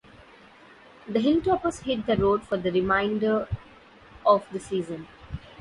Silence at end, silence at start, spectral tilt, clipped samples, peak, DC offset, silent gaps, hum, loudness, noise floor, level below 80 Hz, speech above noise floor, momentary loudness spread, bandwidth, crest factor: 0.05 s; 1.05 s; -6.5 dB/octave; under 0.1%; -6 dBFS; under 0.1%; none; none; -25 LUFS; -51 dBFS; -48 dBFS; 27 dB; 16 LU; 11.5 kHz; 20 dB